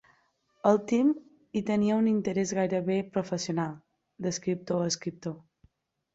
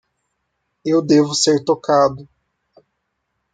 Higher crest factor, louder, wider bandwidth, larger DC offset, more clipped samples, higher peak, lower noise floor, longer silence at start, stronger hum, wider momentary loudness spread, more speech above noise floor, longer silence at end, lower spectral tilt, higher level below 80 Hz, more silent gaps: about the same, 20 dB vs 18 dB; second, -29 LUFS vs -16 LUFS; second, 8 kHz vs 9.4 kHz; neither; neither; second, -8 dBFS vs -2 dBFS; second, -69 dBFS vs -73 dBFS; second, 0.65 s vs 0.85 s; neither; about the same, 11 LU vs 9 LU; second, 42 dB vs 58 dB; second, 0.75 s vs 1.3 s; about the same, -5.5 dB/octave vs -4.5 dB/octave; second, -68 dBFS vs -60 dBFS; neither